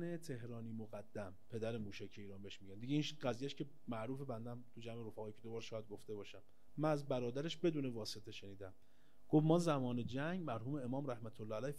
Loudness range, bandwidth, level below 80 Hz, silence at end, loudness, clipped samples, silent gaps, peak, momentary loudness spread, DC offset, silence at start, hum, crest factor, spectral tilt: 7 LU; 14 kHz; -78 dBFS; 0 s; -43 LUFS; under 0.1%; none; -22 dBFS; 15 LU; 0.3%; 0 s; none; 22 dB; -6.5 dB/octave